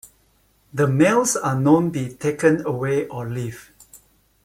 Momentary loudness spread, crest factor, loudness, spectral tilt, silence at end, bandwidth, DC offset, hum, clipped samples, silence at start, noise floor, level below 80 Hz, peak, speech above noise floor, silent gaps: 13 LU; 18 dB; -20 LUFS; -6 dB/octave; 0.5 s; 16 kHz; under 0.1%; none; under 0.1%; 0.75 s; -61 dBFS; -56 dBFS; -4 dBFS; 41 dB; none